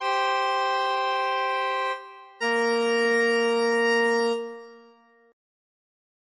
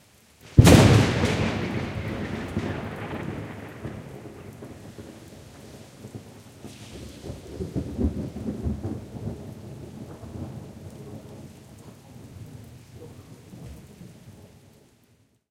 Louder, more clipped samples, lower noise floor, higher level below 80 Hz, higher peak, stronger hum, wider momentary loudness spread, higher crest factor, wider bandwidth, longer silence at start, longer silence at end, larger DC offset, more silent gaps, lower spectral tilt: about the same, -24 LUFS vs -24 LUFS; neither; second, -56 dBFS vs -62 dBFS; second, -82 dBFS vs -40 dBFS; second, -12 dBFS vs 0 dBFS; neither; second, 10 LU vs 25 LU; second, 14 dB vs 26 dB; second, 10 kHz vs 16 kHz; second, 0 s vs 0.45 s; first, 1.55 s vs 1.05 s; neither; neither; second, -2.5 dB/octave vs -6 dB/octave